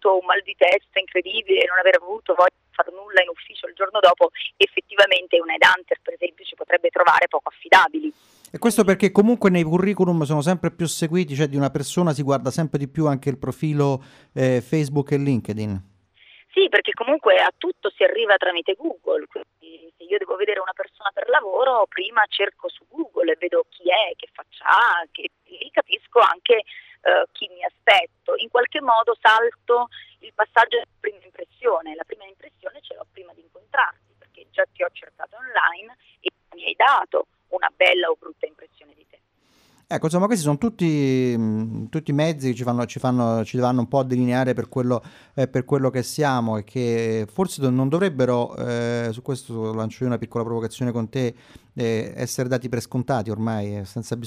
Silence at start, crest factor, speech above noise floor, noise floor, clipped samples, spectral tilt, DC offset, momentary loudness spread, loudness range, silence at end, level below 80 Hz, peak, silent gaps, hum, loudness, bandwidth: 0 s; 20 dB; 39 dB; -61 dBFS; under 0.1%; -5.5 dB/octave; under 0.1%; 14 LU; 7 LU; 0 s; -62 dBFS; -2 dBFS; none; none; -21 LUFS; 15.5 kHz